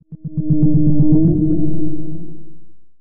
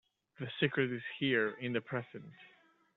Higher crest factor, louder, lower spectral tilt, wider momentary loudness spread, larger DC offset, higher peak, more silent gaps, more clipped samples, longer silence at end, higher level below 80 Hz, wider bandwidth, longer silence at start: second, 10 dB vs 22 dB; first, -16 LUFS vs -35 LUFS; first, -16.5 dB/octave vs -4 dB/octave; about the same, 17 LU vs 18 LU; neither; first, -2 dBFS vs -16 dBFS; neither; neither; second, 0.3 s vs 0.5 s; first, -32 dBFS vs -78 dBFS; second, 1.1 kHz vs 4.3 kHz; second, 0 s vs 0.4 s